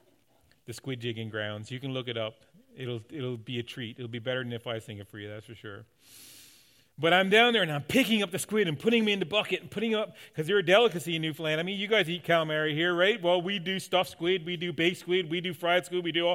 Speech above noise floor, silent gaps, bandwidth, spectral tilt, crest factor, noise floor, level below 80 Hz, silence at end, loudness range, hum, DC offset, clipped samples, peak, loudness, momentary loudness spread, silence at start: 38 dB; none; 16.5 kHz; -4.5 dB/octave; 20 dB; -67 dBFS; -74 dBFS; 0 s; 11 LU; none; under 0.1%; under 0.1%; -8 dBFS; -28 LUFS; 15 LU; 0.7 s